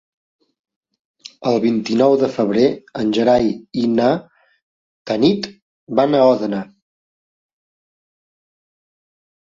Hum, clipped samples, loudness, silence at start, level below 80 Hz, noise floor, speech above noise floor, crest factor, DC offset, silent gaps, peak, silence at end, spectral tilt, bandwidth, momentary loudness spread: none; under 0.1%; -17 LUFS; 1.4 s; -56 dBFS; under -90 dBFS; over 74 dB; 18 dB; under 0.1%; 4.62-5.06 s, 5.62-5.87 s; -2 dBFS; 2.8 s; -6.5 dB/octave; 7.6 kHz; 10 LU